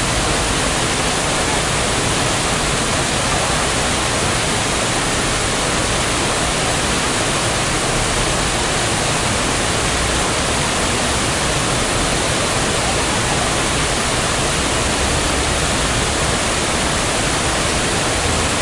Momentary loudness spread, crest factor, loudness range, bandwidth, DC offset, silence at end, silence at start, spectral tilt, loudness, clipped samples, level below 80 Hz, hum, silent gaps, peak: 0 LU; 14 dB; 0 LU; 11.5 kHz; under 0.1%; 0 s; 0 s; -2.5 dB/octave; -16 LUFS; under 0.1%; -28 dBFS; none; none; -4 dBFS